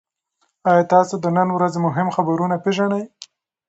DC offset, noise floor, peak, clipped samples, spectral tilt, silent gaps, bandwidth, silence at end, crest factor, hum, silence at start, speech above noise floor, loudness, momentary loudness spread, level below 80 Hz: under 0.1%; -69 dBFS; -2 dBFS; under 0.1%; -7 dB/octave; none; 8.2 kHz; 0.45 s; 18 dB; none; 0.65 s; 51 dB; -19 LUFS; 7 LU; -66 dBFS